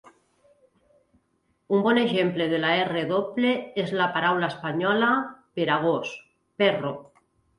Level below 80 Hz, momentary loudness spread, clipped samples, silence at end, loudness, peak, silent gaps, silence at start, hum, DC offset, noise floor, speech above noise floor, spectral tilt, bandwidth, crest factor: -68 dBFS; 8 LU; under 0.1%; 0.55 s; -24 LUFS; -8 dBFS; none; 1.7 s; none; under 0.1%; -71 dBFS; 47 dB; -6.5 dB/octave; 11.5 kHz; 18 dB